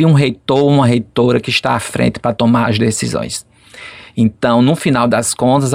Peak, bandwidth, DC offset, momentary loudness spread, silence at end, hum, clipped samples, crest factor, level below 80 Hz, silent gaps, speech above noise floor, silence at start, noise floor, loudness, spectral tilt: -2 dBFS; 15.5 kHz; under 0.1%; 11 LU; 0 s; none; under 0.1%; 12 dB; -46 dBFS; none; 23 dB; 0 s; -35 dBFS; -14 LUFS; -5.5 dB/octave